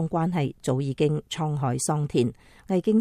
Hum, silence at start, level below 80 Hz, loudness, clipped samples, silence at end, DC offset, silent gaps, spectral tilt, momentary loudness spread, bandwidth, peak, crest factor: none; 0 s; -56 dBFS; -26 LUFS; under 0.1%; 0 s; under 0.1%; none; -6 dB/octave; 4 LU; 14 kHz; -8 dBFS; 16 dB